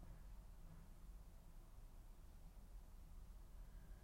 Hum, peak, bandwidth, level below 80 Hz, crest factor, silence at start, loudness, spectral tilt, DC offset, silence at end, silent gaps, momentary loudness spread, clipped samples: none; -48 dBFS; 16 kHz; -58 dBFS; 10 dB; 0 s; -64 LUFS; -5.5 dB/octave; under 0.1%; 0 s; none; 3 LU; under 0.1%